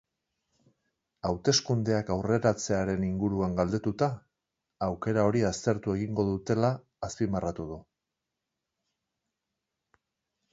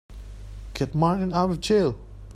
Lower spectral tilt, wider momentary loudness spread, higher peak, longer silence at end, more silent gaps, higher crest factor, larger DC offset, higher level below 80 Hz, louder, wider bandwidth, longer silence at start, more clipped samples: about the same, -5.5 dB/octave vs -6.5 dB/octave; second, 10 LU vs 20 LU; about the same, -10 dBFS vs -8 dBFS; first, 2.7 s vs 0 s; neither; about the same, 22 dB vs 18 dB; neither; second, -52 dBFS vs -42 dBFS; second, -29 LUFS vs -24 LUFS; second, 8 kHz vs 13.5 kHz; first, 1.25 s vs 0.1 s; neither